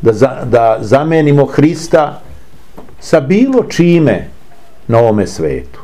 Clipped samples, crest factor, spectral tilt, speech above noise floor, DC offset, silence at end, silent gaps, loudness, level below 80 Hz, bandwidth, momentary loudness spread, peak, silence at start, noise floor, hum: 0.6%; 12 dB; -7 dB/octave; 32 dB; 3%; 0 s; none; -11 LUFS; -38 dBFS; 13.5 kHz; 9 LU; 0 dBFS; 0 s; -42 dBFS; none